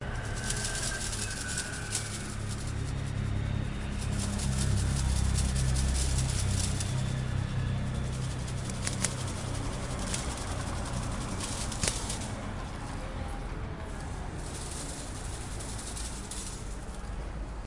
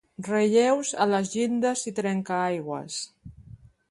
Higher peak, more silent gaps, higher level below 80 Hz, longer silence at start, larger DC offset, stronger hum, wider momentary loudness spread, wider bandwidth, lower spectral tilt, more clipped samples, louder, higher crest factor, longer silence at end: about the same, -6 dBFS vs -8 dBFS; neither; first, -38 dBFS vs -62 dBFS; second, 0 s vs 0.2 s; first, 0.2% vs under 0.1%; neither; about the same, 10 LU vs 11 LU; about the same, 11.5 kHz vs 11.5 kHz; about the same, -4 dB/octave vs -4.5 dB/octave; neither; second, -33 LUFS vs -26 LUFS; first, 26 dB vs 18 dB; second, 0 s vs 0.35 s